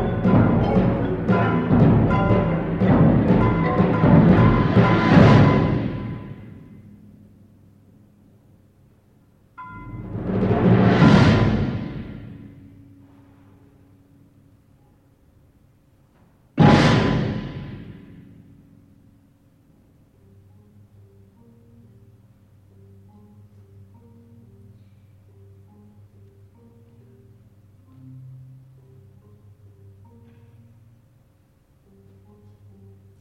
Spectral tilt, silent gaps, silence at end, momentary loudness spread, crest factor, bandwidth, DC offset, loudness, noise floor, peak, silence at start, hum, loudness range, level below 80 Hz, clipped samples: -8.5 dB/octave; none; 4.85 s; 25 LU; 20 dB; 8.4 kHz; under 0.1%; -17 LUFS; -58 dBFS; -2 dBFS; 0 s; none; 17 LU; -38 dBFS; under 0.1%